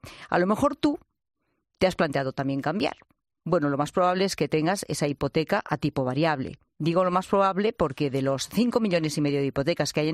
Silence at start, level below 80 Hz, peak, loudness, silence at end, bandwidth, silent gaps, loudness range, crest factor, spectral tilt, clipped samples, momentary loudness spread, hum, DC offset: 0.05 s; -54 dBFS; -8 dBFS; -26 LUFS; 0 s; 15.5 kHz; none; 2 LU; 18 dB; -5.5 dB/octave; under 0.1%; 5 LU; none; under 0.1%